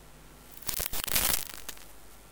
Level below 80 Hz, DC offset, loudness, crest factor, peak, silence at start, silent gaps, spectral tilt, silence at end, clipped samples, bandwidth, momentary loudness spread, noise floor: -48 dBFS; under 0.1%; -29 LUFS; 28 dB; -6 dBFS; 0 s; none; -0.5 dB/octave; 0 s; under 0.1%; 19.5 kHz; 23 LU; -52 dBFS